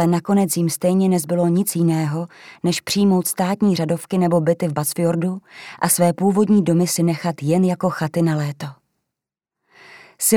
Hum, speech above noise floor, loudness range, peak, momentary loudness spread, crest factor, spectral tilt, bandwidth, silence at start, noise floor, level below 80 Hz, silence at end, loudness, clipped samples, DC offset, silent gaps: none; 67 dB; 3 LU; -2 dBFS; 9 LU; 16 dB; -5.5 dB/octave; 17.5 kHz; 0 s; -85 dBFS; -64 dBFS; 0 s; -19 LUFS; under 0.1%; under 0.1%; none